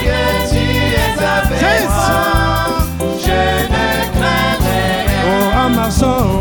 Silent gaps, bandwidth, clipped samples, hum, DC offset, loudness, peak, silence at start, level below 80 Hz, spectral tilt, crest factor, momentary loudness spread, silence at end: none; over 20 kHz; under 0.1%; none; under 0.1%; -14 LUFS; 0 dBFS; 0 s; -22 dBFS; -5 dB/octave; 12 dB; 2 LU; 0 s